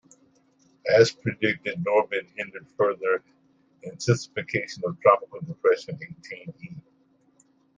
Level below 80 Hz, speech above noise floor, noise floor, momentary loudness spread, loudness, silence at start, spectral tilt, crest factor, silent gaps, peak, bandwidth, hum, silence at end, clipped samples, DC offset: -66 dBFS; 39 dB; -63 dBFS; 19 LU; -25 LUFS; 0.85 s; -5.5 dB/octave; 24 dB; none; -4 dBFS; 9.6 kHz; none; 0.95 s; under 0.1%; under 0.1%